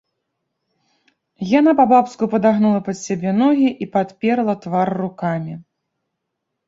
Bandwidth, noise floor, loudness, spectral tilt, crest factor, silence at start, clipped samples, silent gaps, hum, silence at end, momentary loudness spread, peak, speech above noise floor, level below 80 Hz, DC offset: 7.8 kHz; -77 dBFS; -17 LUFS; -7 dB/octave; 18 dB; 1.4 s; under 0.1%; none; none; 1.05 s; 11 LU; -2 dBFS; 61 dB; -62 dBFS; under 0.1%